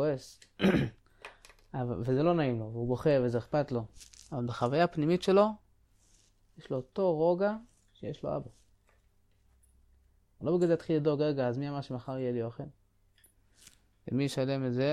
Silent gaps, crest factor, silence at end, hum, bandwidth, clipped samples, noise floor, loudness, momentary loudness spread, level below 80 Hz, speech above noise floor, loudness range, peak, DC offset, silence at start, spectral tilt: none; 20 dB; 0 s; none; 13.5 kHz; under 0.1%; -67 dBFS; -31 LUFS; 19 LU; -60 dBFS; 37 dB; 6 LU; -12 dBFS; under 0.1%; 0 s; -7.5 dB/octave